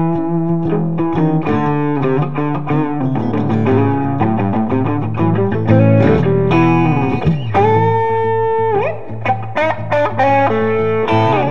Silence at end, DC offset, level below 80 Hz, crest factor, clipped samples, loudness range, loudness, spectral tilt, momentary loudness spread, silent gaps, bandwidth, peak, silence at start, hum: 0 s; 4%; -42 dBFS; 14 dB; under 0.1%; 3 LU; -15 LUFS; -9.5 dB/octave; 5 LU; none; 6.6 kHz; 0 dBFS; 0 s; none